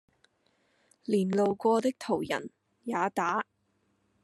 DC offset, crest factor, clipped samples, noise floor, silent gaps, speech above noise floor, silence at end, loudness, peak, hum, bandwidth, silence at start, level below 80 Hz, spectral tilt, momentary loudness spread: under 0.1%; 18 dB; under 0.1%; -74 dBFS; none; 45 dB; 0.8 s; -30 LUFS; -14 dBFS; none; 13 kHz; 1.1 s; -74 dBFS; -6 dB/octave; 17 LU